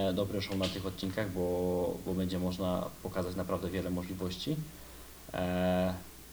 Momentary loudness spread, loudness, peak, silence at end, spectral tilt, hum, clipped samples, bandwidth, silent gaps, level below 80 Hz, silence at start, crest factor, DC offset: 7 LU; -35 LUFS; -18 dBFS; 0 s; -6 dB/octave; none; under 0.1%; over 20 kHz; none; -56 dBFS; 0 s; 16 dB; under 0.1%